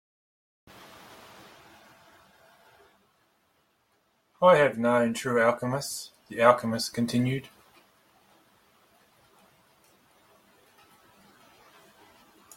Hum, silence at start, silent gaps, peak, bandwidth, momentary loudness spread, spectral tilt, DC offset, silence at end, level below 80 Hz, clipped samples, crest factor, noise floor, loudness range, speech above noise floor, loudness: none; 4.4 s; none; -4 dBFS; 16.5 kHz; 28 LU; -5 dB/octave; under 0.1%; 5.15 s; -70 dBFS; under 0.1%; 26 dB; -70 dBFS; 10 LU; 46 dB; -25 LUFS